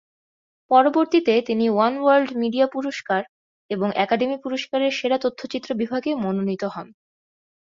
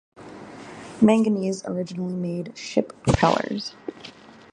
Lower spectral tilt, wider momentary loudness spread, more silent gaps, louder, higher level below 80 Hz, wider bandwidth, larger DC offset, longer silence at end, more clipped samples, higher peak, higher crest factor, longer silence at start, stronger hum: about the same, -6 dB/octave vs -6 dB/octave; second, 10 LU vs 22 LU; first, 3.29-3.69 s vs none; about the same, -22 LUFS vs -23 LUFS; second, -66 dBFS vs -44 dBFS; second, 7.6 kHz vs 10.5 kHz; neither; first, 0.9 s vs 0.4 s; neither; about the same, -4 dBFS vs -2 dBFS; about the same, 20 dB vs 22 dB; first, 0.7 s vs 0.2 s; neither